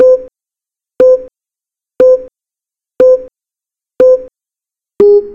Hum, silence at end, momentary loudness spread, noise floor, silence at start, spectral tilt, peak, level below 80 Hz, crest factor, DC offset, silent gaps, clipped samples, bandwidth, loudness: none; 0 s; 6 LU; -87 dBFS; 0 s; -7 dB/octave; 0 dBFS; -48 dBFS; 12 dB; under 0.1%; none; 0.2%; 5.8 kHz; -10 LUFS